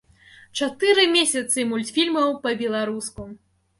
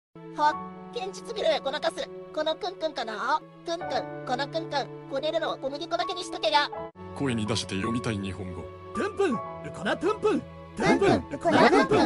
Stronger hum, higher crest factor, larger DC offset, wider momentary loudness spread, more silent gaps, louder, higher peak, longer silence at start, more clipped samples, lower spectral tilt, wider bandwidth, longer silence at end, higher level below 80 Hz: neither; about the same, 18 dB vs 20 dB; neither; first, 16 LU vs 13 LU; neither; first, -21 LUFS vs -28 LUFS; about the same, -6 dBFS vs -6 dBFS; first, 0.55 s vs 0.15 s; neither; second, -2 dB/octave vs -5 dB/octave; about the same, 11.5 kHz vs 12 kHz; first, 0.45 s vs 0 s; about the same, -58 dBFS vs -58 dBFS